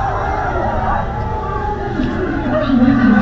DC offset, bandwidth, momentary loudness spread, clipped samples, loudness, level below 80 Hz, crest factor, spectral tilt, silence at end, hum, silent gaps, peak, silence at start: under 0.1%; 7 kHz; 9 LU; under 0.1%; -17 LUFS; -26 dBFS; 14 dB; -8.5 dB/octave; 0 s; none; none; -2 dBFS; 0 s